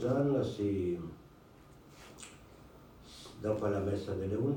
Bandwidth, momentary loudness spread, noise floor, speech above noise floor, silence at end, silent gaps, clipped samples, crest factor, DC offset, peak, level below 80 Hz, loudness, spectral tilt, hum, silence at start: 16.5 kHz; 24 LU; -57 dBFS; 25 dB; 0 s; none; under 0.1%; 16 dB; under 0.1%; -20 dBFS; -62 dBFS; -34 LUFS; -7.5 dB/octave; none; 0 s